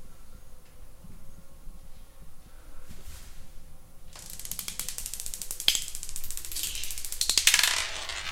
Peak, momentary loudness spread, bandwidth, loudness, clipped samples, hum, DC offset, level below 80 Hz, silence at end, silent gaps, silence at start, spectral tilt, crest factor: -2 dBFS; 26 LU; 17 kHz; -27 LUFS; under 0.1%; none; under 0.1%; -44 dBFS; 0 s; none; 0 s; 1 dB/octave; 32 dB